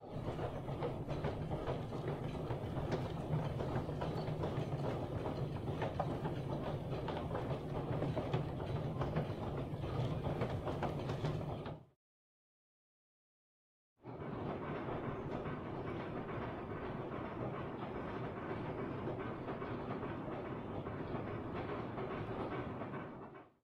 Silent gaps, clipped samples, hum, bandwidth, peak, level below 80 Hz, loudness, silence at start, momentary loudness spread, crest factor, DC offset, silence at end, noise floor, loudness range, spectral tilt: 11.96-13.96 s; under 0.1%; none; 13.5 kHz; -24 dBFS; -56 dBFS; -42 LUFS; 0 s; 5 LU; 18 dB; under 0.1%; 0.15 s; under -90 dBFS; 5 LU; -8 dB/octave